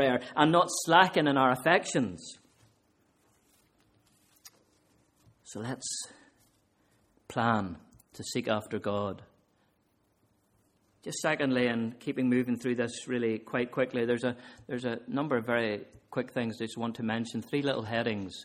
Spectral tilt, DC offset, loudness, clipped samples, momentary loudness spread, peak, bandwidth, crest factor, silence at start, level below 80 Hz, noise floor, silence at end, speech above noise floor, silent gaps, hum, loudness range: -4.5 dB/octave; under 0.1%; -30 LUFS; under 0.1%; 15 LU; -6 dBFS; 15.5 kHz; 26 dB; 0 s; -70 dBFS; -72 dBFS; 0 s; 42 dB; none; none; 15 LU